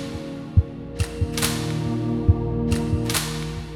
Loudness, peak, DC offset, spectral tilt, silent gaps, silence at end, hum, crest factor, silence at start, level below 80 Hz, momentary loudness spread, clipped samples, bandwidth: -24 LUFS; -4 dBFS; under 0.1%; -5 dB/octave; none; 0 s; none; 18 dB; 0 s; -32 dBFS; 8 LU; under 0.1%; 18 kHz